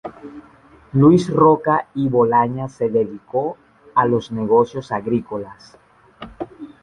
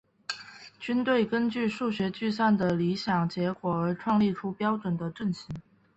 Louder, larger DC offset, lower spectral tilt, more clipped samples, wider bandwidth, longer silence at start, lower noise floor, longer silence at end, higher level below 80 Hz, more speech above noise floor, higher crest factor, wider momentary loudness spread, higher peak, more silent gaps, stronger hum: first, -18 LUFS vs -28 LUFS; neither; first, -8.5 dB/octave vs -7 dB/octave; neither; first, 9.8 kHz vs 8.2 kHz; second, 0.05 s vs 0.3 s; about the same, -48 dBFS vs -48 dBFS; second, 0.15 s vs 0.35 s; first, -52 dBFS vs -62 dBFS; first, 31 dB vs 20 dB; about the same, 18 dB vs 16 dB; first, 19 LU vs 12 LU; first, -2 dBFS vs -14 dBFS; neither; neither